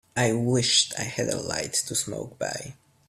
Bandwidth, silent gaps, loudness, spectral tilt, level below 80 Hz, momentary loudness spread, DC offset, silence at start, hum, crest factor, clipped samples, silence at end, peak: 16 kHz; none; -25 LUFS; -3 dB/octave; -60 dBFS; 12 LU; under 0.1%; 0.15 s; none; 20 dB; under 0.1%; 0.35 s; -8 dBFS